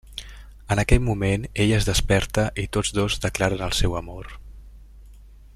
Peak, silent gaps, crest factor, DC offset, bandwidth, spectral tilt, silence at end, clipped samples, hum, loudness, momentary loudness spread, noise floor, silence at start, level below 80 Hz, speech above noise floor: -2 dBFS; none; 22 dB; under 0.1%; 15 kHz; -4.5 dB/octave; 0.2 s; under 0.1%; none; -23 LUFS; 17 LU; -46 dBFS; 0.05 s; -30 dBFS; 24 dB